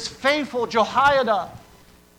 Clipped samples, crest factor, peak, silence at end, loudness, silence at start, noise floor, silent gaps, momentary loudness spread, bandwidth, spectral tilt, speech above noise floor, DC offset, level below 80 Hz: under 0.1%; 16 dB; -6 dBFS; 0.6 s; -20 LUFS; 0 s; -51 dBFS; none; 7 LU; 17 kHz; -3.5 dB/octave; 31 dB; under 0.1%; -52 dBFS